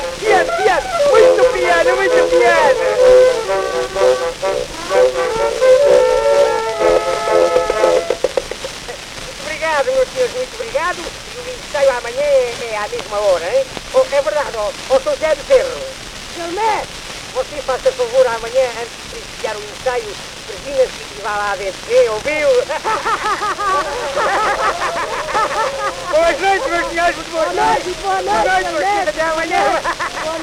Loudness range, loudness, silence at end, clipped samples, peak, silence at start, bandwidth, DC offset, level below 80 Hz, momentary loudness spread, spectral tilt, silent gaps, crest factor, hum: 7 LU; -15 LUFS; 0 s; under 0.1%; 0 dBFS; 0 s; 15 kHz; under 0.1%; -40 dBFS; 13 LU; -2.5 dB/octave; none; 16 dB; none